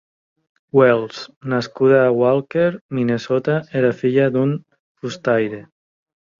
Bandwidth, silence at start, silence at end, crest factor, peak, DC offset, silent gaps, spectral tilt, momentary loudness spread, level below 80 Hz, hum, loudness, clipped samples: 7.4 kHz; 0.75 s; 0.8 s; 18 dB; -2 dBFS; under 0.1%; 1.36-1.41 s, 2.81-2.89 s, 4.80-4.95 s; -7.5 dB/octave; 15 LU; -60 dBFS; none; -18 LUFS; under 0.1%